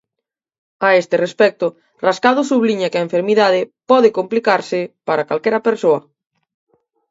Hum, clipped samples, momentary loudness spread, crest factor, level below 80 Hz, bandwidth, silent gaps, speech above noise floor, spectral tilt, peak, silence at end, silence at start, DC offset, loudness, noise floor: none; under 0.1%; 7 LU; 16 dB; -68 dBFS; 8 kHz; none; 66 dB; -5 dB/octave; 0 dBFS; 1.1 s; 0.8 s; under 0.1%; -16 LUFS; -81 dBFS